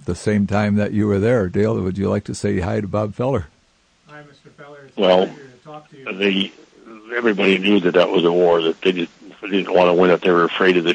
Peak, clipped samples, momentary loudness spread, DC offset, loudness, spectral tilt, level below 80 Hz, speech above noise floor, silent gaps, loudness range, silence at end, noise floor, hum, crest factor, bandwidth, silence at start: -2 dBFS; under 0.1%; 11 LU; under 0.1%; -18 LUFS; -6.5 dB/octave; -52 dBFS; 41 dB; none; 7 LU; 0 s; -59 dBFS; none; 16 dB; 9.8 kHz; 0.05 s